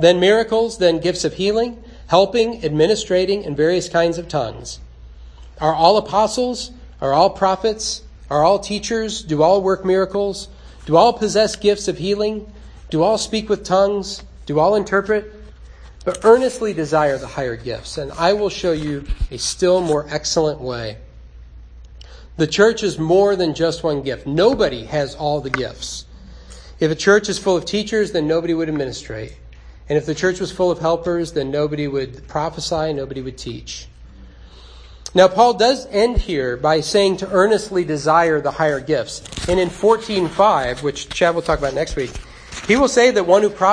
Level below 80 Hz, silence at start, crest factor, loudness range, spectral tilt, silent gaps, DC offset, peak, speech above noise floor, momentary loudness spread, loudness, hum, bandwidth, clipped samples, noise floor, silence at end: -38 dBFS; 0 s; 18 dB; 4 LU; -4.5 dB/octave; none; under 0.1%; 0 dBFS; 23 dB; 13 LU; -18 LUFS; none; 10.5 kHz; under 0.1%; -40 dBFS; 0 s